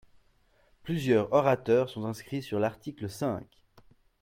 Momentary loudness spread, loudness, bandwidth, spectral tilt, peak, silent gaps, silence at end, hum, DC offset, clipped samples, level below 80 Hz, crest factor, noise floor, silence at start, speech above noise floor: 14 LU; -29 LUFS; 16.5 kHz; -7 dB/octave; -10 dBFS; none; 0.8 s; none; under 0.1%; under 0.1%; -64 dBFS; 20 dB; -66 dBFS; 0.85 s; 37 dB